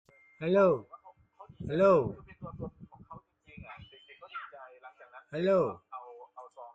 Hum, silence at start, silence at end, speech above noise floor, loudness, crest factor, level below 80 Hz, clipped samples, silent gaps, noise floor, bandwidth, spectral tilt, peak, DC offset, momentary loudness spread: none; 0.4 s; 0.05 s; 28 dB; -28 LUFS; 20 dB; -64 dBFS; under 0.1%; none; -56 dBFS; 7.6 kHz; -8.5 dB/octave; -12 dBFS; under 0.1%; 26 LU